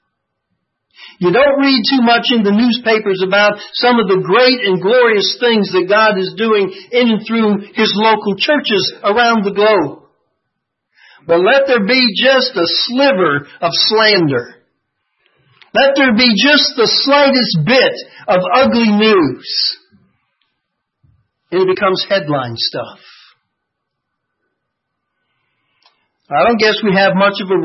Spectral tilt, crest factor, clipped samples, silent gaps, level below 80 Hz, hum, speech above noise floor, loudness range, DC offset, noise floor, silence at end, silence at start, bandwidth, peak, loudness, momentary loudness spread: -5.5 dB/octave; 14 dB; under 0.1%; none; -56 dBFS; none; 62 dB; 7 LU; under 0.1%; -74 dBFS; 0 s; 1 s; 6 kHz; 0 dBFS; -12 LUFS; 7 LU